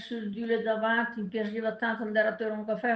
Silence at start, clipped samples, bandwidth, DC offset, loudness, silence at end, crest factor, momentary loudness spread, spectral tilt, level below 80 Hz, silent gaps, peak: 0 s; under 0.1%; 6.2 kHz; under 0.1%; -30 LUFS; 0 s; 16 dB; 6 LU; -7 dB/octave; -76 dBFS; none; -14 dBFS